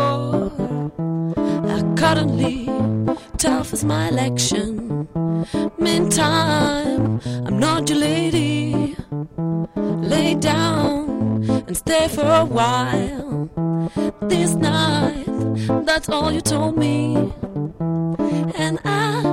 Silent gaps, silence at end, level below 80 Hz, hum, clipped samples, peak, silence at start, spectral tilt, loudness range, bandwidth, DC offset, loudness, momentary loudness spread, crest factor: none; 0 s; -42 dBFS; none; under 0.1%; -2 dBFS; 0 s; -5 dB/octave; 2 LU; 16 kHz; under 0.1%; -20 LUFS; 7 LU; 18 dB